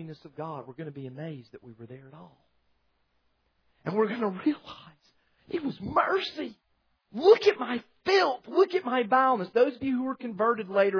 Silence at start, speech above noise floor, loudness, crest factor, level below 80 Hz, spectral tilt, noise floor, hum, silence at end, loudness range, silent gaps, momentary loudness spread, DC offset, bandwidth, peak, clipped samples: 0 s; 45 dB; -26 LUFS; 22 dB; -66 dBFS; -6 dB/octave; -72 dBFS; none; 0 s; 18 LU; none; 20 LU; under 0.1%; 5.4 kHz; -6 dBFS; under 0.1%